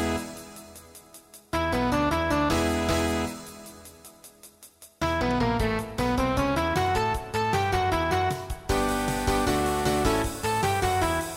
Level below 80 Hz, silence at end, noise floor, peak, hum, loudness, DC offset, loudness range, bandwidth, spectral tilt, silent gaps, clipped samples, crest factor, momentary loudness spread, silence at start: -38 dBFS; 0 s; -52 dBFS; -10 dBFS; none; -26 LUFS; under 0.1%; 3 LU; 16 kHz; -5 dB/octave; none; under 0.1%; 16 dB; 18 LU; 0 s